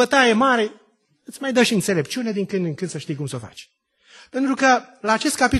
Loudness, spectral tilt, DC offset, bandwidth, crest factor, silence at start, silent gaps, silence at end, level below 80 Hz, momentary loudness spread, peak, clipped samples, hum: -20 LUFS; -4 dB/octave; under 0.1%; 12.5 kHz; 18 dB; 0 s; none; 0 s; -50 dBFS; 14 LU; -2 dBFS; under 0.1%; none